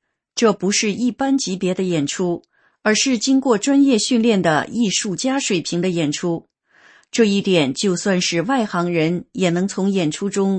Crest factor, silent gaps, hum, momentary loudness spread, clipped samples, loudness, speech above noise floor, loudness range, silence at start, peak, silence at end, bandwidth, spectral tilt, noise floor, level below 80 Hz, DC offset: 16 dB; none; none; 6 LU; under 0.1%; -19 LUFS; 34 dB; 3 LU; 0.35 s; -2 dBFS; 0 s; 8.8 kHz; -4.5 dB/octave; -52 dBFS; -62 dBFS; under 0.1%